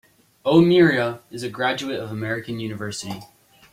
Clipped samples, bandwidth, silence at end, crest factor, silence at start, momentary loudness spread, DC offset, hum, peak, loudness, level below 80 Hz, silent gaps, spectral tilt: under 0.1%; 15 kHz; 0.5 s; 18 dB; 0.45 s; 16 LU; under 0.1%; none; -2 dBFS; -21 LUFS; -60 dBFS; none; -6 dB/octave